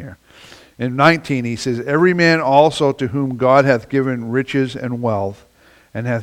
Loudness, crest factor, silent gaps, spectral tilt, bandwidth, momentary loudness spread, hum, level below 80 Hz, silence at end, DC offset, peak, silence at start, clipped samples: -16 LUFS; 16 dB; none; -6.5 dB/octave; 15.5 kHz; 11 LU; none; -54 dBFS; 0 s; under 0.1%; 0 dBFS; 0 s; under 0.1%